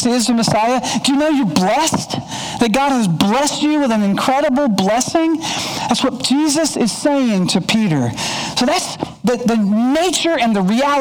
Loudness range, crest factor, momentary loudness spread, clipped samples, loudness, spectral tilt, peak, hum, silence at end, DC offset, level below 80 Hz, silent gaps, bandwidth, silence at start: 1 LU; 16 dB; 4 LU; under 0.1%; -16 LUFS; -4 dB/octave; 0 dBFS; none; 0 s; under 0.1%; -48 dBFS; none; over 20 kHz; 0 s